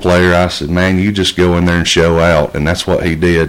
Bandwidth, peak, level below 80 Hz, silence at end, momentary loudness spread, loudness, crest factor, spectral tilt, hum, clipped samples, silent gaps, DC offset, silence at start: 15.5 kHz; -2 dBFS; -28 dBFS; 0 s; 5 LU; -12 LUFS; 10 dB; -5.5 dB/octave; none; under 0.1%; none; under 0.1%; 0 s